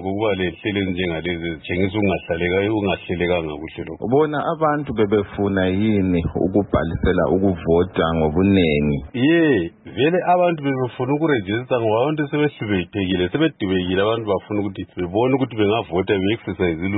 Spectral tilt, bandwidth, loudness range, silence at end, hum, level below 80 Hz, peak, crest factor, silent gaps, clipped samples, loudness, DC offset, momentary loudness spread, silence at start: -12 dB/octave; 4.1 kHz; 3 LU; 0 s; none; -40 dBFS; -6 dBFS; 14 dB; none; under 0.1%; -20 LUFS; under 0.1%; 6 LU; 0 s